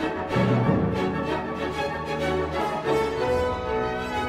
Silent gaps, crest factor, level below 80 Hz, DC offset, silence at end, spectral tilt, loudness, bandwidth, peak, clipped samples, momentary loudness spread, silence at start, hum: none; 16 dB; -42 dBFS; under 0.1%; 0 s; -7 dB/octave; -25 LUFS; 15.5 kHz; -8 dBFS; under 0.1%; 6 LU; 0 s; none